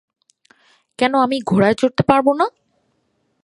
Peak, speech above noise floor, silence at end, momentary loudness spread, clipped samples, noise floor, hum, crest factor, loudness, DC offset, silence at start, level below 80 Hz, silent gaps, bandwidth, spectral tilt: 0 dBFS; 51 dB; 0.95 s; 6 LU; under 0.1%; -66 dBFS; none; 18 dB; -17 LUFS; under 0.1%; 1 s; -54 dBFS; none; 11.5 kHz; -6.5 dB/octave